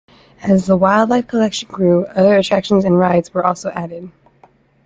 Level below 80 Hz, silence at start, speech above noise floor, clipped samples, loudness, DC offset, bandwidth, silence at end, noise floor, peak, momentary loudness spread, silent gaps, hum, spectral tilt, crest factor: -52 dBFS; 0.4 s; 37 dB; under 0.1%; -15 LUFS; under 0.1%; 7.8 kHz; 0.75 s; -51 dBFS; -2 dBFS; 12 LU; none; none; -6.5 dB/octave; 14 dB